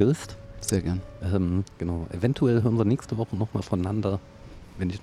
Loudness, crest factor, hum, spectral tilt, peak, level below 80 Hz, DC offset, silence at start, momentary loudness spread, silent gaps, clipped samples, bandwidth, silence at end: -27 LUFS; 18 dB; none; -7 dB/octave; -8 dBFS; -46 dBFS; under 0.1%; 0 s; 11 LU; none; under 0.1%; 15.5 kHz; 0 s